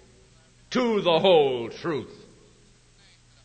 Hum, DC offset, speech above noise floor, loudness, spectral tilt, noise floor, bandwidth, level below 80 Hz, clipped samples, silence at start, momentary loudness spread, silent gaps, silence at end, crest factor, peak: none; under 0.1%; 34 dB; -23 LUFS; -5.5 dB/octave; -56 dBFS; 9 kHz; -60 dBFS; under 0.1%; 0.7 s; 13 LU; none; 1.35 s; 18 dB; -8 dBFS